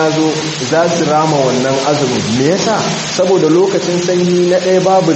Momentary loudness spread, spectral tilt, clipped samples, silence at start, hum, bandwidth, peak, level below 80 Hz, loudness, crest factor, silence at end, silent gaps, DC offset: 4 LU; -4.5 dB/octave; under 0.1%; 0 s; none; 8.6 kHz; 0 dBFS; -52 dBFS; -12 LUFS; 12 dB; 0 s; none; under 0.1%